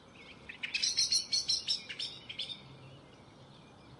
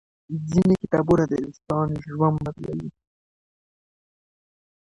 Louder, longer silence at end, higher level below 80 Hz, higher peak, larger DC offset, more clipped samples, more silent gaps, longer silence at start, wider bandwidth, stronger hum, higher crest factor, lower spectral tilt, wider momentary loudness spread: second, -32 LUFS vs -23 LUFS; second, 0 s vs 1.95 s; second, -70 dBFS vs -50 dBFS; second, -18 dBFS vs -6 dBFS; neither; neither; neither; second, 0 s vs 0.3 s; about the same, 11.5 kHz vs 10.5 kHz; neither; about the same, 20 dB vs 20 dB; second, 0.5 dB/octave vs -9 dB/octave; first, 23 LU vs 13 LU